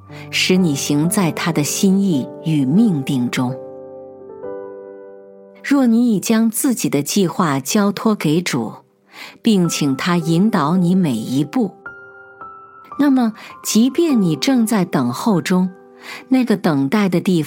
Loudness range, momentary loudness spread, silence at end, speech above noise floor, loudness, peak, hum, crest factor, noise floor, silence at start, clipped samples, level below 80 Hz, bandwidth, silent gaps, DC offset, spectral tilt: 3 LU; 19 LU; 0 s; 25 dB; -17 LUFS; -2 dBFS; none; 16 dB; -41 dBFS; 0.1 s; under 0.1%; -68 dBFS; 17 kHz; none; under 0.1%; -5 dB/octave